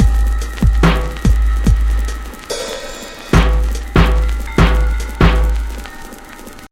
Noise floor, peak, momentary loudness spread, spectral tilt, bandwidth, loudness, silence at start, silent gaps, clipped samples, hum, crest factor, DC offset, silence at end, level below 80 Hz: -34 dBFS; 0 dBFS; 16 LU; -6 dB/octave; 14 kHz; -16 LUFS; 0 s; none; under 0.1%; none; 14 dB; under 0.1%; 0.05 s; -16 dBFS